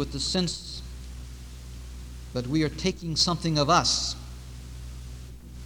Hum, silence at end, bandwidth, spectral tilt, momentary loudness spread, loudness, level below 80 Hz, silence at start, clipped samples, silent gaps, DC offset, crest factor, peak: none; 0 s; over 20 kHz; -4 dB/octave; 21 LU; -26 LUFS; -42 dBFS; 0 s; under 0.1%; none; under 0.1%; 22 dB; -6 dBFS